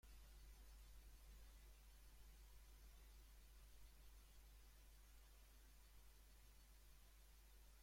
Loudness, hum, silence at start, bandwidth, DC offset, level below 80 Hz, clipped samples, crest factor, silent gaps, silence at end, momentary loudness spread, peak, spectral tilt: -68 LUFS; none; 0.05 s; 16.5 kHz; under 0.1%; -66 dBFS; under 0.1%; 12 dB; none; 0 s; 3 LU; -52 dBFS; -3 dB/octave